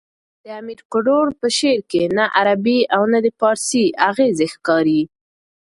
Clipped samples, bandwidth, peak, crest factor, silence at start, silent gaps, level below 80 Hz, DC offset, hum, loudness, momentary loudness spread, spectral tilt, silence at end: under 0.1%; 11.5 kHz; 0 dBFS; 18 dB; 0.45 s; 0.85-0.90 s; -60 dBFS; under 0.1%; none; -17 LUFS; 9 LU; -4 dB/octave; 0.7 s